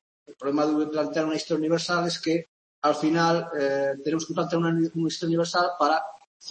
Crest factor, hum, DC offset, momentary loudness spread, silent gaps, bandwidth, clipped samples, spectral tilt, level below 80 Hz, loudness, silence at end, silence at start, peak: 16 dB; none; under 0.1%; 5 LU; 2.48-2.82 s, 6.27-6.40 s; 8.8 kHz; under 0.1%; -5 dB/octave; -72 dBFS; -25 LUFS; 0 s; 0.3 s; -10 dBFS